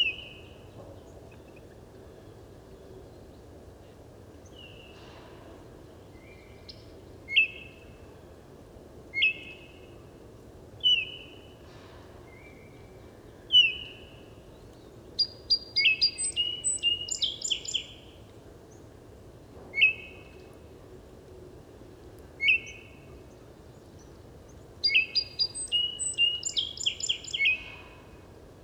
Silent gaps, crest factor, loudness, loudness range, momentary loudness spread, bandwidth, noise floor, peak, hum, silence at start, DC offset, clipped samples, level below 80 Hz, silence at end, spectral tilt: none; 22 dB; -25 LUFS; 23 LU; 27 LU; over 20 kHz; -50 dBFS; -12 dBFS; none; 0 s; under 0.1%; under 0.1%; -58 dBFS; 0.1 s; 0 dB/octave